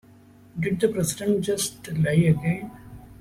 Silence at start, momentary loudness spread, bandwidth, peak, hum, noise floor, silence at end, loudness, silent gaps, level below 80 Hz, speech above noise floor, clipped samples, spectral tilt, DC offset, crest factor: 0.55 s; 15 LU; 15.5 kHz; -8 dBFS; none; -51 dBFS; 0.05 s; -24 LUFS; none; -52 dBFS; 28 dB; under 0.1%; -5.5 dB/octave; under 0.1%; 16 dB